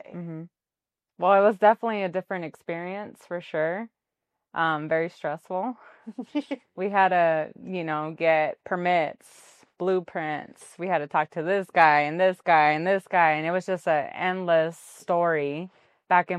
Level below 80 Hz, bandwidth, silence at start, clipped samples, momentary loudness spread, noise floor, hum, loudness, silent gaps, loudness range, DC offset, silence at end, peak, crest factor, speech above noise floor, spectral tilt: -78 dBFS; 12.5 kHz; 0.1 s; under 0.1%; 16 LU; under -90 dBFS; none; -25 LUFS; none; 8 LU; under 0.1%; 0 s; -4 dBFS; 22 dB; over 65 dB; -6 dB/octave